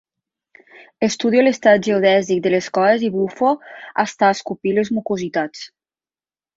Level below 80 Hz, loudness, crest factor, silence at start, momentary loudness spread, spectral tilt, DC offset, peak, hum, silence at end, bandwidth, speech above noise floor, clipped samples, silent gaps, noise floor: -62 dBFS; -18 LUFS; 18 dB; 1 s; 10 LU; -5 dB/octave; under 0.1%; -2 dBFS; none; 0.9 s; 7.8 kHz; over 73 dB; under 0.1%; none; under -90 dBFS